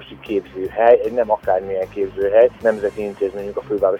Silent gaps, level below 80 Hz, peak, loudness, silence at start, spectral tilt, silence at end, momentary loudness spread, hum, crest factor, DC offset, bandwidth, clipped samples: none; -48 dBFS; -2 dBFS; -19 LUFS; 0 s; -7 dB/octave; 0 s; 11 LU; none; 16 dB; under 0.1%; 9.2 kHz; under 0.1%